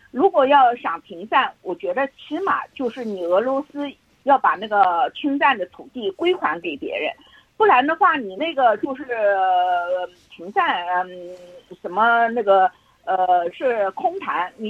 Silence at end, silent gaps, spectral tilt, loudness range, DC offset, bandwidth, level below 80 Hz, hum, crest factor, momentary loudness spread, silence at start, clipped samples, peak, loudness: 0 s; none; -5.5 dB/octave; 3 LU; under 0.1%; 7.4 kHz; -68 dBFS; none; 16 dB; 13 LU; 0.15 s; under 0.1%; -4 dBFS; -20 LUFS